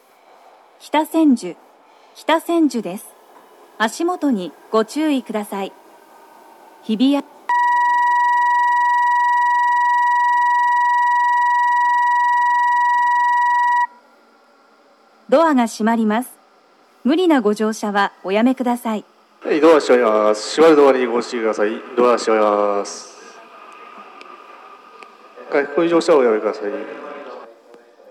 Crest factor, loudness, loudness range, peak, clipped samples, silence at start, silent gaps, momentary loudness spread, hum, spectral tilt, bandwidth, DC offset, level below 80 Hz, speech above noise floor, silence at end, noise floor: 18 dB; -17 LUFS; 7 LU; 0 dBFS; under 0.1%; 0.85 s; none; 12 LU; none; -4.5 dB/octave; 13.5 kHz; under 0.1%; under -90 dBFS; 36 dB; 0.65 s; -53 dBFS